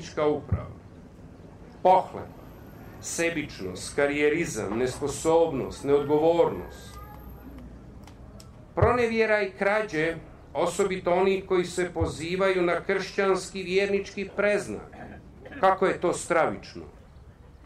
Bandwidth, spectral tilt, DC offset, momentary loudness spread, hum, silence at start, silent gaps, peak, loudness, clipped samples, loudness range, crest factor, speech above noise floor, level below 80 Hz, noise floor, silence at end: 15 kHz; -5 dB/octave; under 0.1%; 22 LU; none; 0 s; none; -8 dBFS; -26 LUFS; under 0.1%; 4 LU; 18 dB; 24 dB; -48 dBFS; -49 dBFS; 0 s